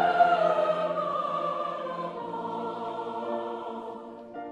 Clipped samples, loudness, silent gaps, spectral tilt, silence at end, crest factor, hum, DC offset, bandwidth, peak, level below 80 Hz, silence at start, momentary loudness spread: under 0.1%; -29 LUFS; none; -6 dB/octave; 0 s; 20 dB; none; under 0.1%; 9.2 kHz; -10 dBFS; -74 dBFS; 0 s; 16 LU